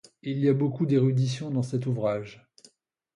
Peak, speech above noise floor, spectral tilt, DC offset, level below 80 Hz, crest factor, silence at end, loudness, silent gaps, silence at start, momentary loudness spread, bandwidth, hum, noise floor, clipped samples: -10 dBFS; 38 dB; -8 dB/octave; under 0.1%; -66 dBFS; 16 dB; 0.8 s; -27 LUFS; none; 0.25 s; 10 LU; 10.5 kHz; none; -63 dBFS; under 0.1%